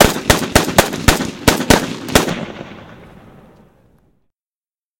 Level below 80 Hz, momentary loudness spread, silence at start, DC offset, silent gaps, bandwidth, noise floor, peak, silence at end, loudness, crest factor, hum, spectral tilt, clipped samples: -30 dBFS; 15 LU; 0 s; under 0.1%; none; over 20 kHz; under -90 dBFS; 0 dBFS; 1.95 s; -14 LUFS; 18 dB; none; -3.5 dB/octave; 0.3%